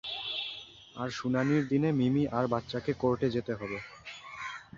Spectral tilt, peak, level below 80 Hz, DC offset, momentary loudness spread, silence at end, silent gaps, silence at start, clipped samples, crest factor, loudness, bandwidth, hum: -6.5 dB/octave; -14 dBFS; -60 dBFS; under 0.1%; 15 LU; 0 s; none; 0.05 s; under 0.1%; 18 dB; -31 LUFS; 7.6 kHz; none